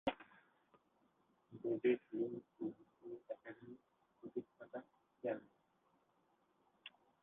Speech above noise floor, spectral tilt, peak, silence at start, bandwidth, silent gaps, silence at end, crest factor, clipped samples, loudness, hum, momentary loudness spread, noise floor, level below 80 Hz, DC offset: 38 dB; -5 dB/octave; -24 dBFS; 0.05 s; 4 kHz; none; 0.35 s; 24 dB; under 0.1%; -45 LUFS; none; 21 LU; -79 dBFS; -80 dBFS; under 0.1%